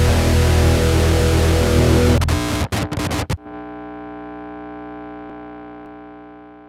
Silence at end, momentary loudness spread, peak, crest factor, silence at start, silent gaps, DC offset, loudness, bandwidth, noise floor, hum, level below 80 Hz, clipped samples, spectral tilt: 0.3 s; 21 LU; -2 dBFS; 16 dB; 0 s; none; under 0.1%; -17 LUFS; 15.5 kHz; -40 dBFS; 60 Hz at -45 dBFS; -24 dBFS; under 0.1%; -5.5 dB/octave